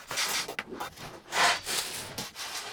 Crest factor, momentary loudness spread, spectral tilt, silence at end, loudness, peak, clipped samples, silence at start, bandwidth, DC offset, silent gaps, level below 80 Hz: 20 dB; 15 LU; -0.5 dB/octave; 0 s; -30 LUFS; -12 dBFS; under 0.1%; 0 s; over 20 kHz; under 0.1%; none; -64 dBFS